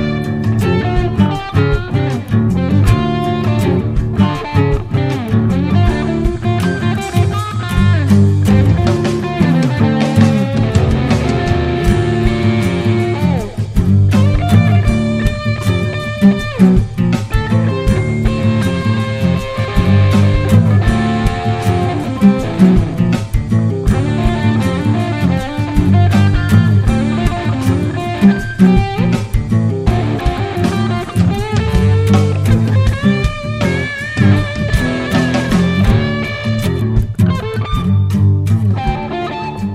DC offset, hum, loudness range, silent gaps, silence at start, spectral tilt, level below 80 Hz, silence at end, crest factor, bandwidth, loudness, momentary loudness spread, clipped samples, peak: 0.2%; none; 2 LU; none; 0 s; -7.5 dB/octave; -24 dBFS; 0 s; 12 dB; 13.5 kHz; -14 LUFS; 6 LU; under 0.1%; 0 dBFS